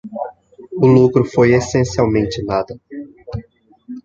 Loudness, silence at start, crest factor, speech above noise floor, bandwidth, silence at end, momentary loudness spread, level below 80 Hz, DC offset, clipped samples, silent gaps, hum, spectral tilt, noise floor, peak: -15 LUFS; 0.05 s; 14 dB; 31 dB; 7.8 kHz; 0.05 s; 20 LU; -42 dBFS; under 0.1%; under 0.1%; none; none; -7 dB/octave; -45 dBFS; -2 dBFS